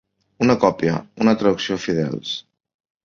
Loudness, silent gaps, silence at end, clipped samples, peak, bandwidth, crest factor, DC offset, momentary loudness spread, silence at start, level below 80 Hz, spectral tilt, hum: -20 LUFS; none; 0.65 s; under 0.1%; -2 dBFS; 7.4 kHz; 18 dB; under 0.1%; 10 LU; 0.4 s; -54 dBFS; -6 dB/octave; none